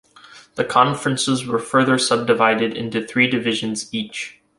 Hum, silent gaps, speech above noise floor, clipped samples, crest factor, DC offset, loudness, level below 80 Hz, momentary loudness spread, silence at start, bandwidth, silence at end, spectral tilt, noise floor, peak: none; none; 27 dB; under 0.1%; 18 dB; under 0.1%; -19 LUFS; -60 dBFS; 10 LU; 0.35 s; 11.5 kHz; 0.25 s; -4 dB/octave; -46 dBFS; -2 dBFS